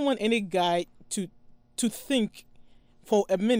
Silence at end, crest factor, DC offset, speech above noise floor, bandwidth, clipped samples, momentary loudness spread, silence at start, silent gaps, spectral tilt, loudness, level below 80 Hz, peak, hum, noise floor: 0 s; 16 dB; under 0.1%; 27 dB; 16 kHz; under 0.1%; 9 LU; 0 s; none; -4 dB/octave; -28 LUFS; -62 dBFS; -12 dBFS; none; -53 dBFS